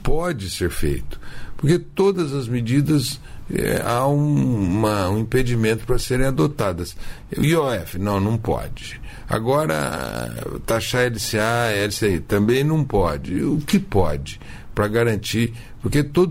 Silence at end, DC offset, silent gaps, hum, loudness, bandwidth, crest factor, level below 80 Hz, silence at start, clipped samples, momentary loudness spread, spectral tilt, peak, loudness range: 0 s; under 0.1%; none; none; -21 LUFS; 16 kHz; 14 dB; -34 dBFS; 0 s; under 0.1%; 11 LU; -6 dB/octave; -6 dBFS; 3 LU